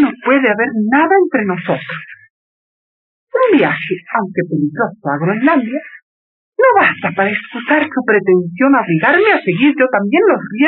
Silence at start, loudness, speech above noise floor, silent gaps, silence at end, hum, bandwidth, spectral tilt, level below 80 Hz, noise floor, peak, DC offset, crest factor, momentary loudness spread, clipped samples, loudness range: 0 s; -13 LUFS; over 77 dB; 2.30-3.27 s, 6.03-6.52 s; 0 s; none; 4.3 kHz; -4.5 dB/octave; -62 dBFS; under -90 dBFS; -2 dBFS; under 0.1%; 12 dB; 9 LU; under 0.1%; 5 LU